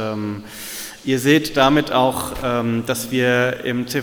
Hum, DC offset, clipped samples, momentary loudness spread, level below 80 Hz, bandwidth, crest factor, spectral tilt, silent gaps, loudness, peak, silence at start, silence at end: none; under 0.1%; under 0.1%; 13 LU; -44 dBFS; 19 kHz; 20 dB; -4.5 dB/octave; none; -19 LUFS; 0 dBFS; 0 s; 0 s